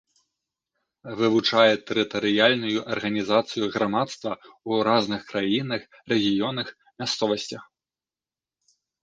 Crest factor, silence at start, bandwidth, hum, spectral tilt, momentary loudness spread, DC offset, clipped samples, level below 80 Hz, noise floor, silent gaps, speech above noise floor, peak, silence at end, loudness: 22 dB; 1.05 s; 9.4 kHz; none; -4.5 dB/octave; 13 LU; under 0.1%; under 0.1%; -66 dBFS; under -90 dBFS; none; over 66 dB; -4 dBFS; 1.4 s; -24 LUFS